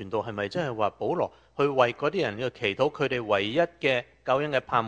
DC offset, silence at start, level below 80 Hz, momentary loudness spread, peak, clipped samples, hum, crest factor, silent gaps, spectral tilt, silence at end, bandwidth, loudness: under 0.1%; 0 s; -62 dBFS; 6 LU; -8 dBFS; under 0.1%; none; 18 dB; none; -6 dB/octave; 0 s; 9.4 kHz; -27 LUFS